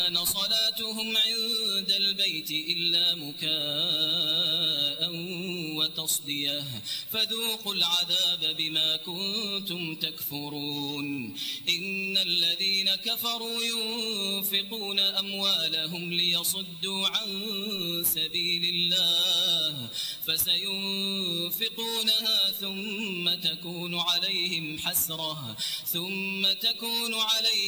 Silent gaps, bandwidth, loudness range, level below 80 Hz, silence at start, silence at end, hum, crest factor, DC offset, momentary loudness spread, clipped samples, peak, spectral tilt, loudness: none; over 20 kHz; 3 LU; -70 dBFS; 0 s; 0 s; none; 16 dB; under 0.1%; 8 LU; under 0.1%; -12 dBFS; -1.5 dB/octave; -26 LUFS